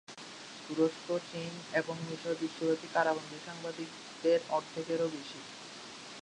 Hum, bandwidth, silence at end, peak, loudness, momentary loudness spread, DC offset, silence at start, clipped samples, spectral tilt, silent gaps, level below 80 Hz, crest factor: none; 11 kHz; 0 s; -14 dBFS; -35 LUFS; 15 LU; under 0.1%; 0.1 s; under 0.1%; -4.5 dB/octave; none; -80 dBFS; 20 dB